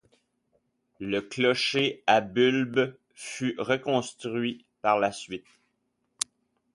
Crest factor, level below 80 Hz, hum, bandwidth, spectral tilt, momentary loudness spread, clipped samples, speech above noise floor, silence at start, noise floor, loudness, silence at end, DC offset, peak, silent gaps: 26 dB; -68 dBFS; none; 11.5 kHz; -4 dB/octave; 15 LU; under 0.1%; 50 dB; 1 s; -76 dBFS; -27 LUFS; 1.35 s; under 0.1%; -2 dBFS; none